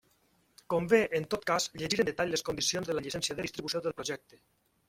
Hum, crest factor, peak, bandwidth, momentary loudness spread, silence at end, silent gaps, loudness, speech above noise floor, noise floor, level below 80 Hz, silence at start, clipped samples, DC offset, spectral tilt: none; 22 dB; -10 dBFS; 16 kHz; 9 LU; 0.7 s; none; -31 LUFS; 38 dB; -70 dBFS; -64 dBFS; 0.7 s; under 0.1%; under 0.1%; -3 dB/octave